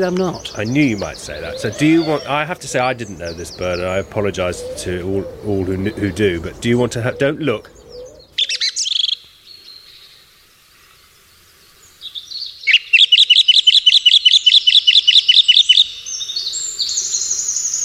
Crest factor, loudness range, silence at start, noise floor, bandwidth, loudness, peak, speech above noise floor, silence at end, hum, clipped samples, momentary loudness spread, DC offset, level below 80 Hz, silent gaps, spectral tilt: 16 dB; 13 LU; 0 s; -49 dBFS; 16 kHz; -13 LUFS; 0 dBFS; 31 dB; 0 s; none; under 0.1%; 17 LU; under 0.1%; -46 dBFS; none; -2 dB/octave